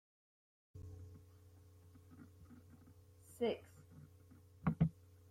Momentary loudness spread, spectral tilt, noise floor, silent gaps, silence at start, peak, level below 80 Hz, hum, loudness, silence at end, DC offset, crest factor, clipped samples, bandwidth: 25 LU; -8 dB/octave; -63 dBFS; none; 0.75 s; -22 dBFS; -66 dBFS; none; -42 LUFS; 0.4 s; under 0.1%; 24 dB; under 0.1%; 14.5 kHz